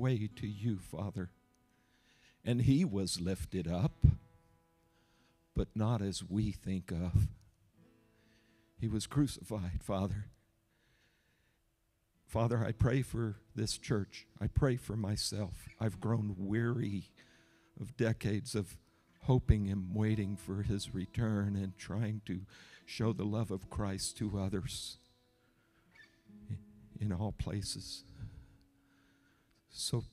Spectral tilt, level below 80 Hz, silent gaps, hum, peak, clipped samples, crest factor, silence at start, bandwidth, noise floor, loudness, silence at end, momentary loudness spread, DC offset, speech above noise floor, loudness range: -6 dB/octave; -48 dBFS; none; none; -12 dBFS; under 0.1%; 26 dB; 0 s; 14 kHz; -77 dBFS; -36 LUFS; 0.05 s; 14 LU; under 0.1%; 42 dB; 8 LU